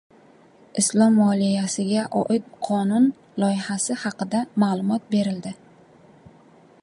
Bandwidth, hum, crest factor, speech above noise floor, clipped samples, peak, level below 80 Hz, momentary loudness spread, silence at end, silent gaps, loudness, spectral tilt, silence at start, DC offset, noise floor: 11.5 kHz; none; 16 dB; 31 dB; under 0.1%; -6 dBFS; -70 dBFS; 9 LU; 1.3 s; none; -22 LUFS; -5 dB/octave; 0.75 s; under 0.1%; -52 dBFS